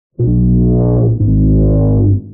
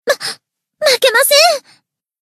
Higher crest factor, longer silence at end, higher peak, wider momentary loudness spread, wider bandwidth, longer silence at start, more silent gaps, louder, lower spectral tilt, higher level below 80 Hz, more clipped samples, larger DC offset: second, 6 dB vs 14 dB; second, 0 s vs 0.65 s; second, -4 dBFS vs 0 dBFS; second, 2 LU vs 15 LU; second, 1.5 kHz vs 14.5 kHz; first, 0.2 s vs 0.05 s; neither; about the same, -12 LUFS vs -11 LUFS; first, -18 dB/octave vs 1.5 dB/octave; first, -18 dBFS vs -68 dBFS; neither; neither